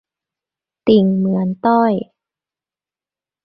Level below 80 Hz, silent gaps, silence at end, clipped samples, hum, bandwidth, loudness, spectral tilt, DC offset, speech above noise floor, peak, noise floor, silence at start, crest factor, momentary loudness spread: -56 dBFS; none; 1.4 s; under 0.1%; none; 5.6 kHz; -16 LUFS; -11 dB/octave; under 0.1%; over 76 dB; 0 dBFS; under -90 dBFS; 0.85 s; 18 dB; 10 LU